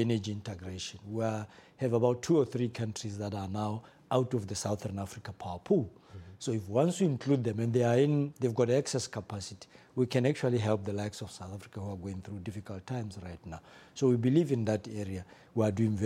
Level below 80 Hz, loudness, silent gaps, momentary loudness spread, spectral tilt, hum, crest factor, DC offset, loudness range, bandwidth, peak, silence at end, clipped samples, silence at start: -66 dBFS; -32 LUFS; none; 15 LU; -6.5 dB/octave; none; 18 dB; under 0.1%; 5 LU; 13.5 kHz; -14 dBFS; 0 s; under 0.1%; 0 s